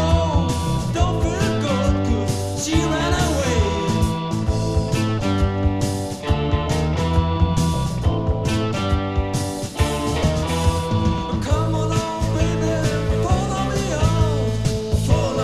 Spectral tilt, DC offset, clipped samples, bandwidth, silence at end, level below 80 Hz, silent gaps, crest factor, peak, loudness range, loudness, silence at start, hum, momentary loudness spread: -6 dB/octave; under 0.1%; under 0.1%; 14 kHz; 0 s; -28 dBFS; none; 16 dB; -4 dBFS; 1 LU; -21 LUFS; 0 s; none; 3 LU